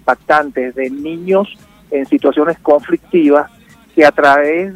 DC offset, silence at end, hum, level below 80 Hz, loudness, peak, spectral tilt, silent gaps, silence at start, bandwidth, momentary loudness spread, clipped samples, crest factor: under 0.1%; 0 s; none; -52 dBFS; -13 LUFS; 0 dBFS; -6.5 dB/octave; none; 0.05 s; 13.5 kHz; 11 LU; 0.2%; 14 dB